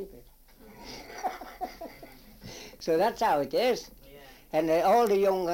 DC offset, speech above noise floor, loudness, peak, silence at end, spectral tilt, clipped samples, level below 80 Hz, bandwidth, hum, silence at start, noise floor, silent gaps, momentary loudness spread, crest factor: under 0.1%; 27 dB; -27 LUFS; -14 dBFS; 0 s; -4.5 dB/octave; under 0.1%; -56 dBFS; 17 kHz; none; 0 s; -53 dBFS; none; 23 LU; 16 dB